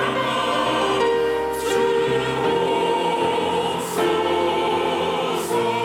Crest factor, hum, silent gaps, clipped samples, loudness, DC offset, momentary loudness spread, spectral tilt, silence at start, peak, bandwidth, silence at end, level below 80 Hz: 12 dB; none; none; under 0.1%; -21 LUFS; under 0.1%; 3 LU; -4 dB/octave; 0 s; -8 dBFS; 17 kHz; 0 s; -52 dBFS